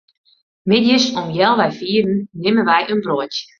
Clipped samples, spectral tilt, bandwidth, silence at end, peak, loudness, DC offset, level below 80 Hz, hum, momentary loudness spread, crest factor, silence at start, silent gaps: under 0.1%; -5 dB/octave; 7.4 kHz; 0.15 s; -2 dBFS; -16 LUFS; under 0.1%; -58 dBFS; none; 7 LU; 16 dB; 0.65 s; none